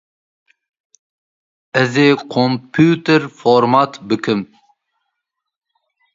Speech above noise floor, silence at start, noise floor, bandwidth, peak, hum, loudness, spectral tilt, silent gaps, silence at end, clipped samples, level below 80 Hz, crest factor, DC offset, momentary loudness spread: 64 dB; 1.75 s; -78 dBFS; 7.8 kHz; 0 dBFS; none; -15 LUFS; -6.5 dB/octave; none; 1.7 s; under 0.1%; -60 dBFS; 18 dB; under 0.1%; 9 LU